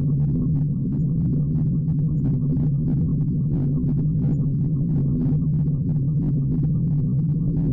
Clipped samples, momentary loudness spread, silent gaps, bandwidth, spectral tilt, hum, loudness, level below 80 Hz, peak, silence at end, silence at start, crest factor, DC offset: under 0.1%; 1 LU; none; 1.4 kHz; -14.5 dB/octave; none; -22 LUFS; -36 dBFS; -16 dBFS; 0 s; 0 s; 6 dB; under 0.1%